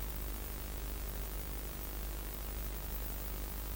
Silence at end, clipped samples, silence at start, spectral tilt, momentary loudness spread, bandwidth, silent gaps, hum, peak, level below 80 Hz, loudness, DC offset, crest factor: 0 s; under 0.1%; 0 s; -4 dB/octave; 2 LU; 17.5 kHz; none; none; -24 dBFS; -42 dBFS; -42 LUFS; under 0.1%; 16 dB